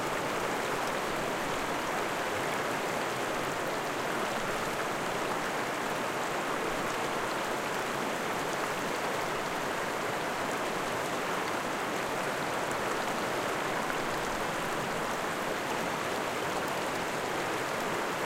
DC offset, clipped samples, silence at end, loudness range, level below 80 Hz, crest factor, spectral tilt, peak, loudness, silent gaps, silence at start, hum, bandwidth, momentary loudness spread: under 0.1%; under 0.1%; 0 s; 0 LU; -58 dBFS; 16 dB; -3 dB/octave; -16 dBFS; -32 LUFS; none; 0 s; none; 16.5 kHz; 1 LU